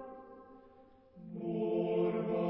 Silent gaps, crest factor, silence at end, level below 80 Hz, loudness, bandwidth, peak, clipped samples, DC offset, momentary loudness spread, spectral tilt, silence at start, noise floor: none; 14 dB; 0 s; -74 dBFS; -35 LUFS; 5.2 kHz; -22 dBFS; under 0.1%; under 0.1%; 23 LU; -7.5 dB/octave; 0 s; -61 dBFS